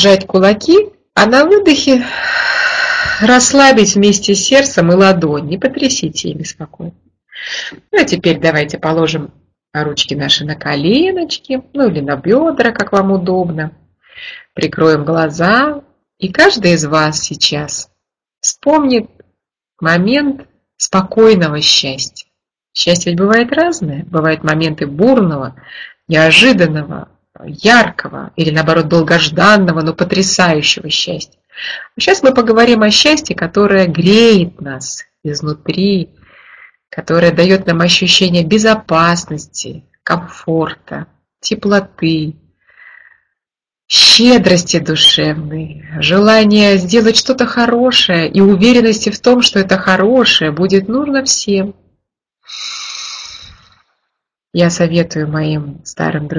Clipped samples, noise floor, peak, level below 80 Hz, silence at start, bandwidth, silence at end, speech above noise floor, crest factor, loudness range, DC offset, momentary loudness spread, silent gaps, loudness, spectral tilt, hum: 0.2%; -85 dBFS; 0 dBFS; -46 dBFS; 0 s; 11 kHz; 0 s; 73 dB; 12 dB; 7 LU; under 0.1%; 16 LU; none; -11 LUFS; -4 dB/octave; none